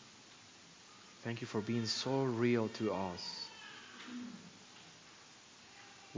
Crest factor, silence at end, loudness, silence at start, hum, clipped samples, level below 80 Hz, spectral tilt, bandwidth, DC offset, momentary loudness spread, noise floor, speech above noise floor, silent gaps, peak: 20 dB; 0 s; -38 LUFS; 0 s; none; under 0.1%; -74 dBFS; -5 dB/octave; 7.6 kHz; under 0.1%; 22 LU; -59 dBFS; 22 dB; none; -20 dBFS